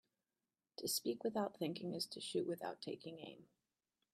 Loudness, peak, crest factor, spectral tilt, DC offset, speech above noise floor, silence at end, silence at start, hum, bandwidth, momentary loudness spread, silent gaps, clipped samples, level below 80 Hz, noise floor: -43 LUFS; -26 dBFS; 20 dB; -4 dB/octave; under 0.1%; over 46 dB; 0.7 s; 0.8 s; none; 15 kHz; 15 LU; none; under 0.1%; -88 dBFS; under -90 dBFS